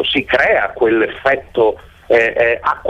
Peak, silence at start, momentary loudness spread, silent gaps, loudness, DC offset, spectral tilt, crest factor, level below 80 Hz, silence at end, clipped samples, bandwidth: -2 dBFS; 0 s; 4 LU; none; -14 LUFS; under 0.1%; -5.5 dB/octave; 12 dB; -44 dBFS; 0 s; under 0.1%; 8.2 kHz